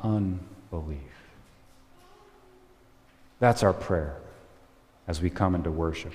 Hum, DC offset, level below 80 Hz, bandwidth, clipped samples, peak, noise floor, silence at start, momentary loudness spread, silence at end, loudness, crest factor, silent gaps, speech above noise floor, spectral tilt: none; under 0.1%; -44 dBFS; 15 kHz; under 0.1%; -6 dBFS; -58 dBFS; 0 s; 19 LU; 0 s; -28 LUFS; 24 dB; none; 31 dB; -7 dB/octave